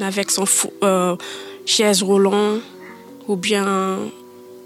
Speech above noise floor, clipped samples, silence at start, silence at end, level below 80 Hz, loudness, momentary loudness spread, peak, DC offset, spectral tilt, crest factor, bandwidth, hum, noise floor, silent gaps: 20 dB; under 0.1%; 0 s; 0 s; -74 dBFS; -18 LUFS; 17 LU; -4 dBFS; under 0.1%; -3 dB/octave; 16 dB; 16 kHz; none; -39 dBFS; none